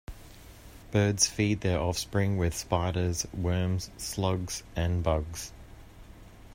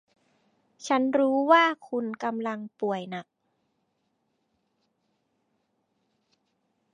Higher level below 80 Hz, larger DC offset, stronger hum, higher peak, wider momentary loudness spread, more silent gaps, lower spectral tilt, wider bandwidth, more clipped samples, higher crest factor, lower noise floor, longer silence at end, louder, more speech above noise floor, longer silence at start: first, -46 dBFS vs -86 dBFS; neither; neither; about the same, -8 dBFS vs -8 dBFS; second, 13 LU vs 16 LU; neither; about the same, -4.5 dB/octave vs -4.5 dB/octave; first, 16 kHz vs 9.8 kHz; neither; about the same, 22 dB vs 22 dB; second, -49 dBFS vs -76 dBFS; second, 0 s vs 3.7 s; second, -29 LUFS vs -25 LUFS; second, 21 dB vs 50 dB; second, 0.1 s vs 0.8 s